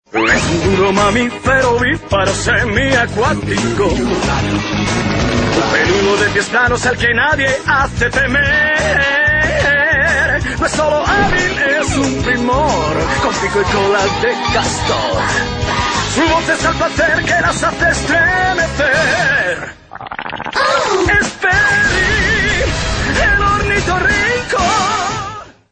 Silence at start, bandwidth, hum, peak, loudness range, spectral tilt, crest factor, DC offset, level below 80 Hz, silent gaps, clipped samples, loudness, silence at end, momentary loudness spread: 0.15 s; 9.8 kHz; none; 0 dBFS; 2 LU; -4 dB/octave; 12 dB; under 0.1%; -28 dBFS; none; under 0.1%; -13 LUFS; 0.2 s; 5 LU